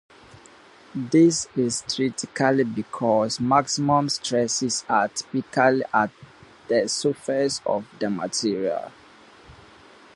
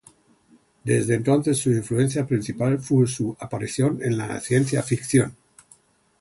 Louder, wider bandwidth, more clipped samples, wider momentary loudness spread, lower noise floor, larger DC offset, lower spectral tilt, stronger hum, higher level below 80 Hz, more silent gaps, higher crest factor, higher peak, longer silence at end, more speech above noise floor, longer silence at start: about the same, -23 LUFS vs -23 LUFS; about the same, 11.5 kHz vs 11.5 kHz; neither; about the same, 8 LU vs 8 LU; second, -50 dBFS vs -58 dBFS; neither; second, -4 dB/octave vs -6 dB/octave; neither; second, -62 dBFS vs -56 dBFS; neither; about the same, 20 dB vs 16 dB; about the same, -4 dBFS vs -6 dBFS; second, 0.65 s vs 0.85 s; second, 27 dB vs 37 dB; about the same, 0.95 s vs 0.85 s